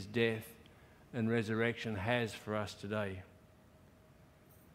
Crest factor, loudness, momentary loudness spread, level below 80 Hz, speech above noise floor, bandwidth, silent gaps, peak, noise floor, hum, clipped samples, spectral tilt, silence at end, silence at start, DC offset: 22 dB; -37 LUFS; 12 LU; -70 dBFS; 26 dB; 16 kHz; none; -16 dBFS; -62 dBFS; none; under 0.1%; -6 dB/octave; 1.45 s; 0 s; under 0.1%